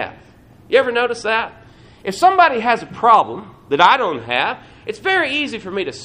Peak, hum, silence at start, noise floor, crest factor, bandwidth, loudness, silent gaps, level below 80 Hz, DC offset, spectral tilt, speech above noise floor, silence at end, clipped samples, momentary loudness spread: 0 dBFS; none; 0 s; -46 dBFS; 18 dB; 14.5 kHz; -16 LUFS; none; -54 dBFS; under 0.1%; -3.5 dB/octave; 29 dB; 0 s; under 0.1%; 16 LU